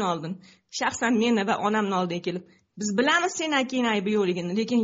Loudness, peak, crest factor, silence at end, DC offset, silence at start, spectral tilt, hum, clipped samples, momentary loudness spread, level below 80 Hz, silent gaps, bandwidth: -25 LUFS; -10 dBFS; 14 dB; 0 s; under 0.1%; 0 s; -3.5 dB/octave; none; under 0.1%; 11 LU; -68 dBFS; none; 8 kHz